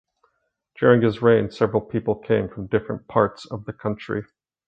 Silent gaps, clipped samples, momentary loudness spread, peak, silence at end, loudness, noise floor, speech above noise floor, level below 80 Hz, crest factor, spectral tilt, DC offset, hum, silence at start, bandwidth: none; under 0.1%; 12 LU; -2 dBFS; 0.45 s; -22 LUFS; -72 dBFS; 50 dB; -52 dBFS; 20 dB; -8.5 dB/octave; under 0.1%; none; 0.8 s; 7.8 kHz